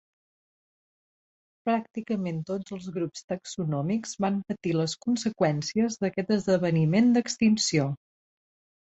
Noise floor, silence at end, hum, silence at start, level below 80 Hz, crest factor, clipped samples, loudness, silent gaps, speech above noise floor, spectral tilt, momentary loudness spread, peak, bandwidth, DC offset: under -90 dBFS; 0.9 s; none; 1.65 s; -66 dBFS; 16 dB; under 0.1%; -27 LUFS; 3.24-3.28 s; over 64 dB; -5.5 dB/octave; 11 LU; -10 dBFS; 8.2 kHz; under 0.1%